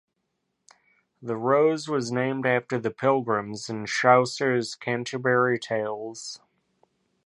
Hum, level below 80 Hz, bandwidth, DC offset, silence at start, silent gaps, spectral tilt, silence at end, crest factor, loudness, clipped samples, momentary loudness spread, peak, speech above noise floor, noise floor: none; -72 dBFS; 11.5 kHz; under 0.1%; 1.2 s; none; -5 dB/octave; 0.9 s; 22 dB; -25 LUFS; under 0.1%; 14 LU; -6 dBFS; 53 dB; -78 dBFS